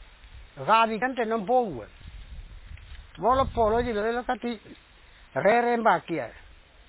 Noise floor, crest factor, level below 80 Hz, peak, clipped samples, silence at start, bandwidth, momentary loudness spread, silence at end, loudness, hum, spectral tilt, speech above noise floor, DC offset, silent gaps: -48 dBFS; 20 dB; -46 dBFS; -8 dBFS; under 0.1%; 0 s; 4 kHz; 24 LU; 0.55 s; -25 LUFS; none; -9 dB/octave; 23 dB; under 0.1%; none